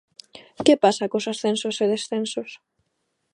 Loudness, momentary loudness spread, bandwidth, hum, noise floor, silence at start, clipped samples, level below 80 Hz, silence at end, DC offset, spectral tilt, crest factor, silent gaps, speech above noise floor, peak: -22 LUFS; 12 LU; 11.5 kHz; none; -75 dBFS; 0.35 s; under 0.1%; -68 dBFS; 0.8 s; under 0.1%; -4 dB/octave; 22 dB; none; 53 dB; -2 dBFS